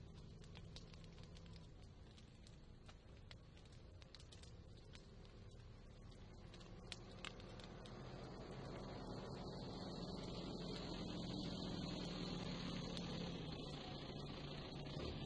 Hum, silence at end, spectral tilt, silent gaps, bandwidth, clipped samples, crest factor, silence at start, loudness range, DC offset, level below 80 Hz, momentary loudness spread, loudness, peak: none; 0 s; -5.5 dB/octave; none; 10.5 kHz; under 0.1%; 22 dB; 0 s; 13 LU; under 0.1%; -62 dBFS; 14 LU; -52 LUFS; -30 dBFS